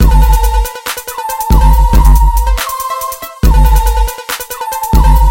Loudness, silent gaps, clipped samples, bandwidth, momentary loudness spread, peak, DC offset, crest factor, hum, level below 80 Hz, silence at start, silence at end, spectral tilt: -12 LUFS; none; 0.1%; 17 kHz; 10 LU; 0 dBFS; under 0.1%; 8 dB; none; -10 dBFS; 0 s; 0 s; -5 dB/octave